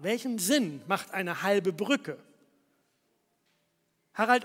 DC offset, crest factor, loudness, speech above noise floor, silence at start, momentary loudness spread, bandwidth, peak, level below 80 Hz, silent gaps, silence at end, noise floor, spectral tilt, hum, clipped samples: under 0.1%; 22 dB; -29 LUFS; 46 dB; 0 s; 12 LU; 16.5 kHz; -8 dBFS; -84 dBFS; none; 0 s; -75 dBFS; -3.5 dB/octave; none; under 0.1%